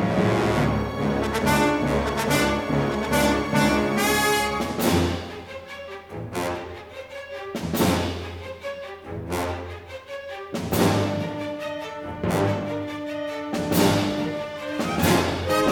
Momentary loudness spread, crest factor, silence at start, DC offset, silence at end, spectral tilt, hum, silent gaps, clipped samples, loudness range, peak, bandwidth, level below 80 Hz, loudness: 15 LU; 18 dB; 0 s; under 0.1%; 0 s; -5 dB/octave; none; none; under 0.1%; 7 LU; -6 dBFS; over 20 kHz; -42 dBFS; -24 LUFS